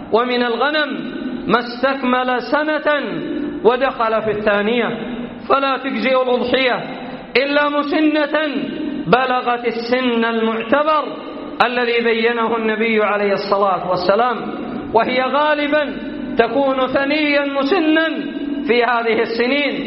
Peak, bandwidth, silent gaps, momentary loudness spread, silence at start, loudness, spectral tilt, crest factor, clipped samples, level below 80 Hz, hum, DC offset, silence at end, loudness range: 0 dBFS; 5.8 kHz; none; 8 LU; 0 s; -17 LUFS; -2 dB/octave; 18 dB; under 0.1%; -52 dBFS; none; under 0.1%; 0 s; 1 LU